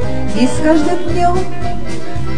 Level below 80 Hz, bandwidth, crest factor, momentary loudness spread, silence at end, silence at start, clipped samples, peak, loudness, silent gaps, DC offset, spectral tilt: -30 dBFS; 10 kHz; 18 dB; 11 LU; 0 s; 0 s; under 0.1%; 0 dBFS; -16 LUFS; none; 20%; -6 dB/octave